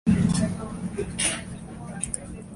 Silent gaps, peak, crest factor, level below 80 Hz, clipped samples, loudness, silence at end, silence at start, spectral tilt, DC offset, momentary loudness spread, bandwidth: none; -10 dBFS; 18 dB; -42 dBFS; under 0.1%; -27 LUFS; 0 s; 0.05 s; -4.5 dB/octave; under 0.1%; 15 LU; 12 kHz